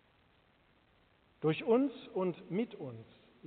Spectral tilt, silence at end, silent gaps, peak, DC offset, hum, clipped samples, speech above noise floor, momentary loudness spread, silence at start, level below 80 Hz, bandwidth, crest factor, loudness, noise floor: -6 dB/octave; 0 s; none; -18 dBFS; under 0.1%; none; under 0.1%; 35 dB; 16 LU; 1.4 s; -78 dBFS; 4.5 kHz; 20 dB; -35 LUFS; -69 dBFS